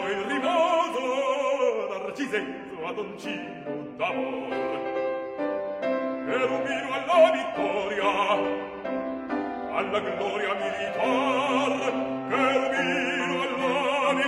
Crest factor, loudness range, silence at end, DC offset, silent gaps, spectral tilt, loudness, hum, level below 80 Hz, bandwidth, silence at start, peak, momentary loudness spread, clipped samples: 18 dB; 6 LU; 0 s; under 0.1%; none; -4 dB/octave; -26 LUFS; none; -64 dBFS; 11.5 kHz; 0 s; -8 dBFS; 9 LU; under 0.1%